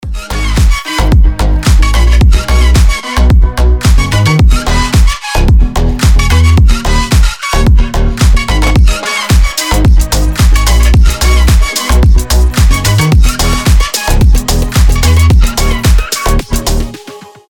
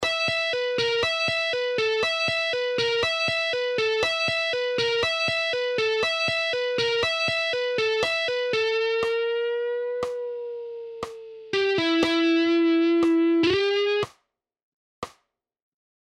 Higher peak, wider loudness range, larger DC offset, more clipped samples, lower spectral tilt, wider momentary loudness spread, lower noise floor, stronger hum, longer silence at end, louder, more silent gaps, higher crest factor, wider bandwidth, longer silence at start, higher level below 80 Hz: first, 0 dBFS vs -8 dBFS; second, 1 LU vs 4 LU; neither; neither; about the same, -4.5 dB/octave vs -3.5 dB/octave; second, 5 LU vs 12 LU; second, -30 dBFS vs -73 dBFS; neither; second, 0.3 s vs 0.9 s; first, -9 LUFS vs -23 LUFS; second, none vs 14.63-15.02 s; second, 6 dB vs 16 dB; first, 18 kHz vs 11.5 kHz; about the same, 0.05 s vs 0 s; first, -8 dBFS vs -60 dBFS